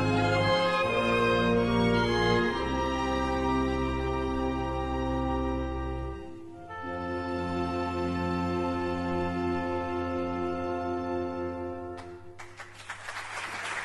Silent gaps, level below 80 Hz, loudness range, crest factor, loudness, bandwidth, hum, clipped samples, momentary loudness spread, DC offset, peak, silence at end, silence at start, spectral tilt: none; -42 dBFS; 8 LU; 18 dB; -29 LUFS; 12 kHz; none; under 0.1%; 15 LU; under 0.1%; -12 dBFS; 0 s; 0 s; -6 dB/octave